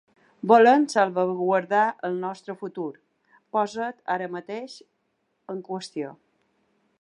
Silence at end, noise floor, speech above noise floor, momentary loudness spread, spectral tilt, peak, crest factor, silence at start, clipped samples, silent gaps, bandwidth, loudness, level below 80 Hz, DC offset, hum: 0.9 s; -74 dBFS; 50 dB; 18 LU; -5.5 dB/octave; -4 dBFS; 22 dB; 0.45 s; under 0.1%; none; 11 kHz; -24 LUFS; -80 dBFS; under 0.1%; none